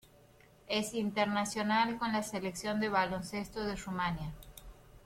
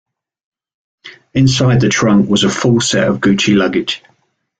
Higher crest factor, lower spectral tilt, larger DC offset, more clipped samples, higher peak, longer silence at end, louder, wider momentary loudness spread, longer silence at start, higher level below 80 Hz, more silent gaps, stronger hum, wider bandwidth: first, 18 dB vs 12 dB; about the same, -4.5 dB/octave vs -5 dB/octave; neither; neither; second, -18 dBFS vs -2 dBFS; second, 0.05 s vs 0.6 s; second, -34 LUFS vs -12 LUFS; first, 11 LU vs 7 LU; second, 0.65 s vs 1.05 s; second, -56 dBFS vs -44 dBFS; neither; neither; first, 16.5 kHz vs 9.4 kHz